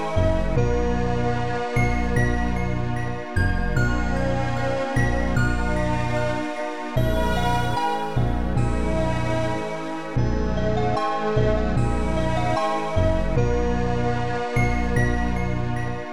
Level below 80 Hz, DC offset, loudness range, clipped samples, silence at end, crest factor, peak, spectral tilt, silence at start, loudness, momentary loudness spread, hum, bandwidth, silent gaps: -28 dBFS; 3%; 1 LU; under 0.1%; 0 s; 14 dB; -8 dBFS; -7 dB/octave; 0 s; -24 LUFS; 4 LU; 60 Hz at -30 dBFS; 12 kHz; none